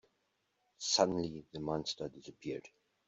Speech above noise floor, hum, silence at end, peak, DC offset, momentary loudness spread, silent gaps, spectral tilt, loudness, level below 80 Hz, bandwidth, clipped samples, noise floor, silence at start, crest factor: 44 dB; none; 0.4 s; -14 dBFS; under 0.1%; 15 LU; none; -3.5 dB/octave; -37 LUFS; -68 dBFS; 8.2 kHz; under 0.1%; -81 dBFS; 0.8 s; 24 dB